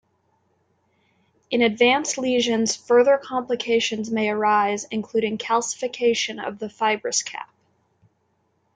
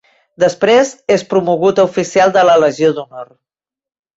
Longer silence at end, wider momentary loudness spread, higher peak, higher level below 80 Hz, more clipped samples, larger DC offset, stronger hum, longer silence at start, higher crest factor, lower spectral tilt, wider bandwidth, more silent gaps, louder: first, 1.3 s vs 0.9 s; first, 9 LU vs 6 LU; second, -4 dBFS vs 0 dBFS; second, -72 dBFS vs -56 dBFS; neither; neither; neither; first, 1.5 s vs 0.4 s; first, 18 dB vs 12 dB; second, -2.5 dB/octave vs -4.5 dB/octave; first, 9.4 kHz vs 8 kHz; neither; second, -22 LUFS vs -12 LUFS